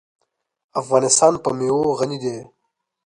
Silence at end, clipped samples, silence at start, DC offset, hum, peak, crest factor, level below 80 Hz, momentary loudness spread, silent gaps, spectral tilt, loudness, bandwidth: 0.6 s; under 0.1%; 0.75 s; under 0.1%; none; -2 dBFS; 20 dB; -62 dBFS; 14 LU; none; -4 dB/octave; -19 LUFS; 11 kHz